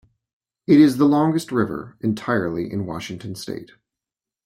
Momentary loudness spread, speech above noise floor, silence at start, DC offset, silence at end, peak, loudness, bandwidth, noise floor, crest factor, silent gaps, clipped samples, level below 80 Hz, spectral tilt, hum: 17 LU; 69 dB; 0.7 s; under 0.1%; 0.8 s; -4 dBFS; -20 LUFS; 14.5 kHz; -88 dBFS; 18 dB; none; under 0.1%; -58 dBFS; -7 dB/octave; none